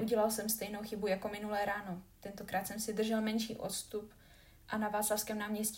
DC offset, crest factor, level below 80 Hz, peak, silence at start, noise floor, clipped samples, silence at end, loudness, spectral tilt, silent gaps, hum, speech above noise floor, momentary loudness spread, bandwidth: under 0.1%; 18 dB; -64 dBFS; -20 dBFS; 0 s; -60 dBFS; under 0.1%; 0 s; -37 LUFS; -3.5 dB/octave; none; none; 23 dB; 12 LU; 16.5 kHz